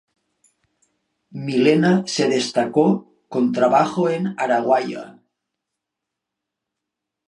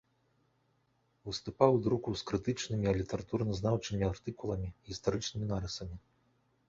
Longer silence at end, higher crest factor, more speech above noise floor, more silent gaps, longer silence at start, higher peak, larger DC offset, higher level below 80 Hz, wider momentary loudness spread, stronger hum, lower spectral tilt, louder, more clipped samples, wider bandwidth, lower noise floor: first, 2.15 s vs 0.7 s; second, 18 dB vs 26 dB; first, 65 dB vs 41 dB; neither; about the same, 1.35 s vs 1.25 s; first, -2 dBFS vs -10 dBFS; neither; second, -70 dBFS vs -52 dBFS; about the same, 12 LU vs 13 LU; neither; about the same, -5.5 dB/octave vs -6 dB/octave; first, -19 LUFS vs -34 LUFS; neither; first, 11 kHz vs 7.8 kHz; first, -83 dBFS vs -75 dBFS